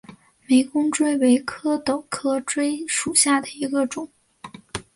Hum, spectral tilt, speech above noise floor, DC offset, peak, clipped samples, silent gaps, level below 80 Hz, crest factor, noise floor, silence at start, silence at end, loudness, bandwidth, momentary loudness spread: none; -2.5 dB/octave; 22 dB; under 0.1%; -2 dBFS; under 0.1%; none; -60 dBFS; 20 dB; -43 dBFS; 0.1 s; 0.15 s; -21 LUFS; 11.5 kHz; 10 LU